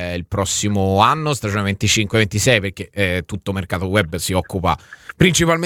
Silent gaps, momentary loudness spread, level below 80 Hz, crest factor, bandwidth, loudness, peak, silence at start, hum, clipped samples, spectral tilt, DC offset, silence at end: none; 9 LU; -40 dBFS; 18 dB; 18 kHz; -18 LUFS; 0 dBFS; 0 s; none; under 0.1%; -4 dB/octave; under 0.1%; 0 s